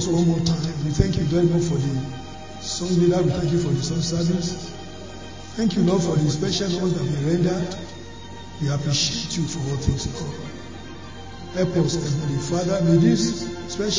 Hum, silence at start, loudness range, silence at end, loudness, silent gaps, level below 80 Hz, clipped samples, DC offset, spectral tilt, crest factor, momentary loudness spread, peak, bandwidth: none; 0 s; 4 LU; 0 s; -22 LUFS; none; -40 dBFS; under 0.1%; 0.8%; -5.5 dB/octave; 22 dB; 18 LU; 0 dBFS; 7.6 kHz